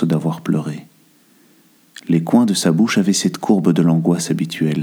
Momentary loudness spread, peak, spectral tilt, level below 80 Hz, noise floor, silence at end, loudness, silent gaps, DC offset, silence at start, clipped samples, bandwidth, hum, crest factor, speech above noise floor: 7 LU; -2 dBFS; -5.5 dB/octave; -64 dBFS; -53 dBFS; 0 s; -17 LUFS; none; under 0.1%; 0 s; under 0.1%; 17 kHz; none; 16 dB; 37 dB